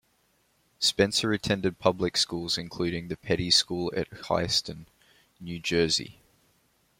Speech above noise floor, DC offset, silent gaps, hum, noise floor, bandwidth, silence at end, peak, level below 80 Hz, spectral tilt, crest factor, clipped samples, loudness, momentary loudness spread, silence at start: 41 dB; under 0.1%; none; none; -69 dBFS; 16.5 kHz; 0.9 s; -6 dBFS; -56 dBFS; -3.5 dB/octave; 24 dB; under 0.1%; -26 LUFS; 12 LU; 0.8 s